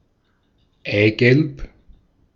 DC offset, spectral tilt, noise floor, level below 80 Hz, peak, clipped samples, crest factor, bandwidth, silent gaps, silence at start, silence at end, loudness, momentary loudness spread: under 0.1%; -8 dB/octave; -64 dBFS; -44 dBFS; 0 dBFS; under 0.1%; 20 dB; 7.2 kHz; none; 0.85 s; 0.7 s; -17 LUFS; 19 LU